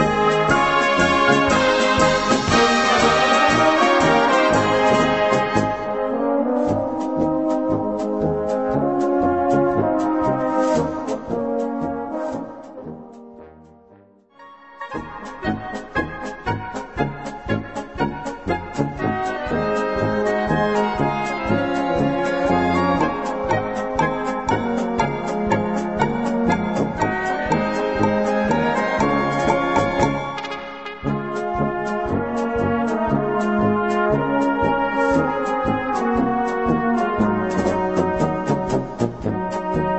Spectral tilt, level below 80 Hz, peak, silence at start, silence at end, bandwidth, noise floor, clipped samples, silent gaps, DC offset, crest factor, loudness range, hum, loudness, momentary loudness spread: -5.5 dB/octave; -42 dBFS; -2 dBFS; 0 s; 0 s; 8.4 kHz; -51 dBFS; under 0.1%; none; 0.3%; 18 dB; 11 LU; none; -20 LUFS; 10 LU